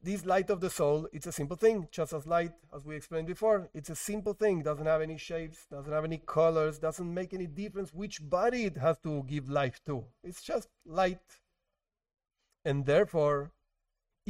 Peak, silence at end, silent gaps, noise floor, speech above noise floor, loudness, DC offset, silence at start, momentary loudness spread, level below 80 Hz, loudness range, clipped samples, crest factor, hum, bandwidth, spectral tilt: -14 dBFS; 0.8 s; none; -88 dBFS; 56 dB; -32 LUFS; under 0.1%; 0.05 s; 12 LU; -56 dBFS; 3 LU; under 0.1%; 18 dB; none; 16 kHz; -6 dB/octave